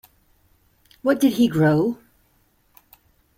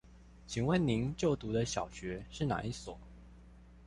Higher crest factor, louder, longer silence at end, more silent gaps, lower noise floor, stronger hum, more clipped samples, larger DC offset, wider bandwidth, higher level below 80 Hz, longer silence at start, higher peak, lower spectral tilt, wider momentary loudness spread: about the same, 18 dB vs 20 dB; first, -20 LUFS vs -35 LUFS; first, 1.45 s vs 0 s; neither; first, -62 dBFS vs -56 dBFS; neither; neither; neither; first, 16.5 kHz vs 11.5 kHz; second, -60 dBFS vs -54 dBFS; first, 1.05 s vs 0.05 s; first, -6 dBFS vs -18 dBFS; about the same, -7 dB/octave vs -6 dB/octave; second, 9 LU vs 12 LU